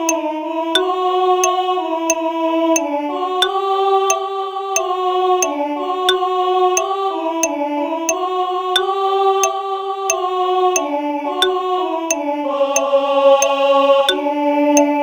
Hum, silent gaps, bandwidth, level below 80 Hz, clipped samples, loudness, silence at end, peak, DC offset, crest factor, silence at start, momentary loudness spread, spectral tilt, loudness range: none; none; over 20 kHz; -64 dBFS; under 0.1%; -17 LUFS; 0 s; 0 dBFS; under 0.1%; 16 dB; 0 s; 7 LU; 0 dB/octave; 3 LU